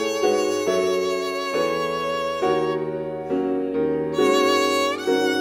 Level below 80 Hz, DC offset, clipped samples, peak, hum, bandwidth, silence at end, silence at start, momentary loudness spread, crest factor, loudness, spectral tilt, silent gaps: -60 dBFS; under 0.1%; under 0.1%; -8 dBFS; none; 16 kHz; 0 s; 0 s; 6 LU; 14 dB; -22 LUFS; -4 dB/octave; none